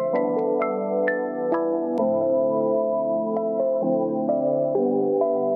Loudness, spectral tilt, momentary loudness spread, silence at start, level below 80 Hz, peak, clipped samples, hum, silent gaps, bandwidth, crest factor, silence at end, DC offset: -23 LUFS; -10.5 dB/octave; 3 LU; 0 s; -74 dBFS; -10 dBFS; under 0.1%; none; none; 3.1 kHz; 12 dB; 0 s; under 0.1%